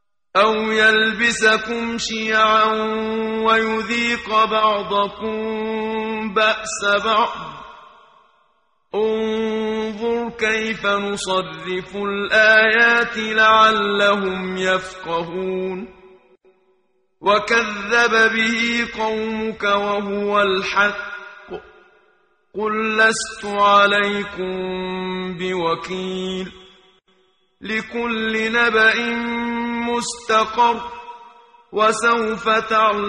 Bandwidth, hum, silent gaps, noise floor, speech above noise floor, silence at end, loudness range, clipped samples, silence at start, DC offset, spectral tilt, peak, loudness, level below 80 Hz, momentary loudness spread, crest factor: 11 kHz; none; none; -65 dBFS; 46 dB; 0 s; 8 LU; under 0.1%; 0.35 s; under 0.1%; -3 dB/octave; -2 dBFS; -18 LUFS; -52 dBFS; 12 LU; 18 dB